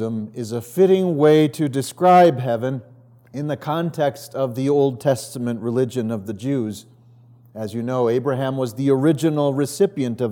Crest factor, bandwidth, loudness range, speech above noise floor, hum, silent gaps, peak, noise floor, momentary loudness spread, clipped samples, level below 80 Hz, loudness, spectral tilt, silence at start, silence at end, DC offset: 16 dB; 18.5 kHz; 6 LU; 30 dB; none; none; -4 dBFS; -49 dBFS; 13 LU; under 0.1%; -72 dBFS; -20 LUFS; -7 dB/octave; 0 s; 0 s; under 0.1%